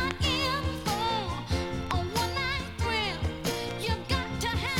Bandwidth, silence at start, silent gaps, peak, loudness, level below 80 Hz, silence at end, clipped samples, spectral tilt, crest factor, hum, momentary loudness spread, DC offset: 17.5 kHz; 0 s; none; -12 dBFS; -30 LUFS; -40 dBFS; 0 s; under 0.1%; -4.5 dB/octave; 18 dB; none; 4 LU; under 0.1%